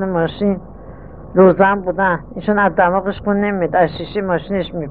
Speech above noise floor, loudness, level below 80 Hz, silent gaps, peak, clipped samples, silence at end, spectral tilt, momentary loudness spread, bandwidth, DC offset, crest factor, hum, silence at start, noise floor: 19 dB; -16 LUFS; -40 dBFS; none; 0 dBFS; under 0.1%; 0 s; -10.5 dB/octave; 9 LU; 4.7 kHz; 0.7%; 16 dB; none; 0 s; -35 dBFS